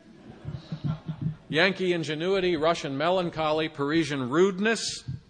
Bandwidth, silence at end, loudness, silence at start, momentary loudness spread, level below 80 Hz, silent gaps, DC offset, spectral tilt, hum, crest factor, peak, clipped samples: 10 kHz; 0.1 s; -26 LUFS; 0.05 s; 11 LU; -56 dBFS; none; under 0.1%; -5 dB/octave; none; 20 dB; -6 dBFS; under 0.1%